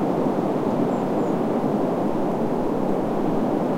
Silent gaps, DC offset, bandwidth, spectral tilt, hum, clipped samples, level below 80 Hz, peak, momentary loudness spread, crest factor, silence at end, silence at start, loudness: none; 1%; 16.5 kHz; -8.5 dB/octave; none; under 0.1%; -46 dBFS; -10 dBFS; 1 LU; 12 dB; 0 s; 0 s; -23 LUFS